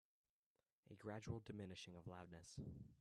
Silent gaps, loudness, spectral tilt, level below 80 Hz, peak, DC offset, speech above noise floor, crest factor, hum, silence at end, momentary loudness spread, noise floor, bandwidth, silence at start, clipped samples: none; -56 LUFS; -5.5 dB/octave; -74 dBFS; -36 dBFS; under 0.1%; over 35 dB; 20 dB; none; 0 s; 6 LU; under -90 dBFS; 12.5 kHz; 0.85 s; under 0.1%